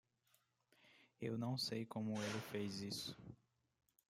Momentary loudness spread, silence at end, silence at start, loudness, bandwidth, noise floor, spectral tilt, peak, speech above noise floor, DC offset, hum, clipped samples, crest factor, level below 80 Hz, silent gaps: 13 LU; 0.8 s; 0.85 s; -45 LUFS; 16 kHz; -80 dBFS; -5 dB/octave; -30 dBFS; 35 dB; under 0.1%; none; under 0.1%; 18 dB; -82 dBFS; none